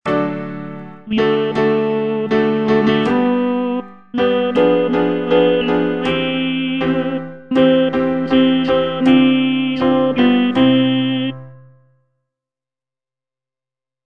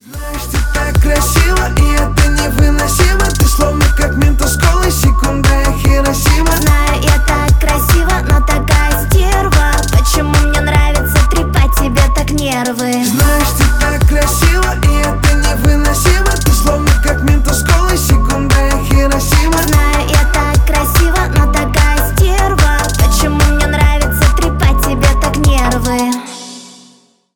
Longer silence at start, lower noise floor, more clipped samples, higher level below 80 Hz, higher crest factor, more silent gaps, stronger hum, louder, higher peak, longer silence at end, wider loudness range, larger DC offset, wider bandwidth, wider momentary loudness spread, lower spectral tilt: about the same, 0.05 s vs 0.05 s; first, under -90 dBFS vs -47 dBFS; neither; second, -50 dBFS vs -12 dBFS; first, 16 dB vs 10 dB; neither; neither; second, -16 LUFS vs -12 LUFS; about the same, 0 dBFS vs 0 dBFS; first, 2.5 s vs 0.65 s; about the same, 3 LU vs 1 LU; first, 0.6% vs under 0.1%; second, 6 kHz vs 19.5 kHz; first, 9 LU vs 2 LU; first, -7.5 dB/octave vs -4.5 dB/octave